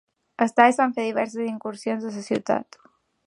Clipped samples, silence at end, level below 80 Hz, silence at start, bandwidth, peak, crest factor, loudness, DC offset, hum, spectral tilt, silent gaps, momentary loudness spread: under 0.1%; 0.65 s; -74 dBFS; 0.4 s; 11.5 kHz; -2 dBFS; 24 dB; -23 LUFS; under 0.1%; none; -5 dB/octave; none; 12 LU